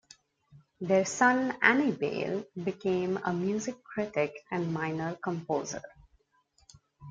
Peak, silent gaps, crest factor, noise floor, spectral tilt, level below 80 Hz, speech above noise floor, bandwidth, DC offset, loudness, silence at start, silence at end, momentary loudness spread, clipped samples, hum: -6 dBFS; none; 24 dB; -70 dBFS; -5 dB/octave; -68 dBFS; 40 dB; 9.4 kHz; under 0.1%; -30 LUFS; 0.55 s; 0 s; 12 LU; under 0.1%; none